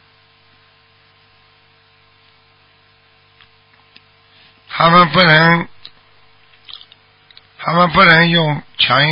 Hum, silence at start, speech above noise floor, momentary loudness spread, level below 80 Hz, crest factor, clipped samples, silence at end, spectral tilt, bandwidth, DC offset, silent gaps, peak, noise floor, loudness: 50 Hz at -55 dBFS; 4.7 s; 41 dB; 27 LU; -48 dBFS; 16 dB; under 0.1%; 0 s; -8 dB/octave; 5.6 kHz; under 0.1%; none; 0 dBFS; -52 dBFS; -11 LUFS